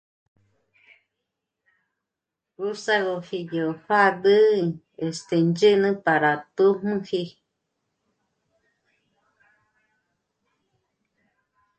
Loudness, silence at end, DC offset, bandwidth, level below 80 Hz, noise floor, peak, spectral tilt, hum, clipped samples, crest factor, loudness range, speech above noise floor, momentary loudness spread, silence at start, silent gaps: -22 LUFS; 4.5 s; under 0.1%; 8.8 kHz; -70 dBFS; -86 dBFS; -6 dBFS; -6 dB/octave; none; under 0.1%; 20 dB; 10 LU; 64 dB; 13 LU; 2.6 s; none